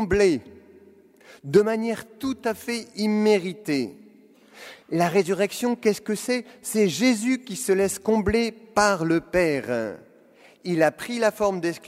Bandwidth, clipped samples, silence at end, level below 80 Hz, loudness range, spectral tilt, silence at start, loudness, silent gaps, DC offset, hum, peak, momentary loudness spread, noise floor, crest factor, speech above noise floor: 16 kHz; under 0.1%; 0 s; -50 dBFS; 3 LU; -5 dB/octave; 0 s; -24 LUFS; none; under 0.1%; none; -6 dBFS; 10 LU; -54 dBFS; 18 dB; 30 dB